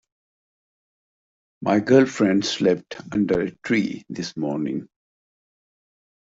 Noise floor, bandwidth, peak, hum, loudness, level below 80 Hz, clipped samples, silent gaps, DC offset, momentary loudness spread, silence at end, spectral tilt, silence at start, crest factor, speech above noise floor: under -90 dBFS; 8 kHz; -4 dBFS; none; -22 LUFS; -60 dBFS; under 0.1%; none; under 0.1%; 13 LU; 1.5 s; -5.5 dB/octave; 1.6 s; 20 dB; over 69 dB